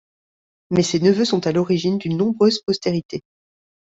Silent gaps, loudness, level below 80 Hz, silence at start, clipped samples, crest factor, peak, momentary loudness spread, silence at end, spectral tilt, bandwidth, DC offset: 3.05-3.09 s; -19 LUFS; -58 dBFS; 0.7 s; under 0.1%; 16 dB; -4 dBFS; 8 LU; 0.75 s; -6 dB/octave; 8 kHz; under 0.1%